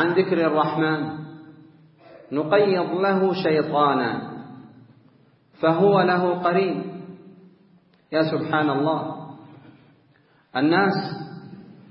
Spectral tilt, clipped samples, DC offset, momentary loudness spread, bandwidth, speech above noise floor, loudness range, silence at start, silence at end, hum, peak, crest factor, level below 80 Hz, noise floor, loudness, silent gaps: -11 dB/octave; under 0.1%; under 0.1%; 19 LU; 5.8 kHz; 38 dB; 4 LU; 0 s; 0.2 s; none; -4 dBFS; 18 dB; -70 dBFS; -59 dBFS; -22 LUFS; none